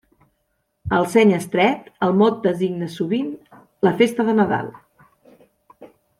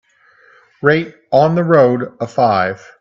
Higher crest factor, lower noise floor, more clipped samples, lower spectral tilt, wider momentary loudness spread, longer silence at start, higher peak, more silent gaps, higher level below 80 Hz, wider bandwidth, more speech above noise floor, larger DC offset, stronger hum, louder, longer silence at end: about the same, 18 dB vs 16 dB; first, -71 dBFS vs -50 dBFS; neither; second, -6.5 dB/octave vs -8 dB/octave; about the same, 10 LU vs 9 LU; about the same, 0.85 s vs 0.85 s; about the same, -2 dBFS vs 0 dBFS; neither; about the same, -54 dBFS vs -58 dBFS; first, 14 kHz vs 7.4 kHz; first, 53 dB vs 36 dB; neither; neither; second, -19 LUFS vs -14 LUFS; about the same, 0.35 s vs 0.25 s